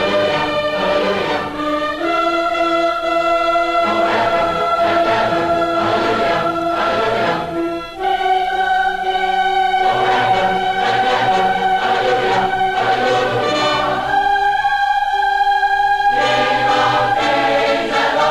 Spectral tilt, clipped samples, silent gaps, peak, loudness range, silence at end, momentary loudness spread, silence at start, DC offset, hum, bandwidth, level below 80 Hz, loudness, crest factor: -4 dB/octave; under 0.1%; none; -4 dBFS; 2 LU; 0 s; 3 LU; 0 s; under 0.1%; none; 13.5 kHz; -44 dBFS; -16 LUFS; 12 dB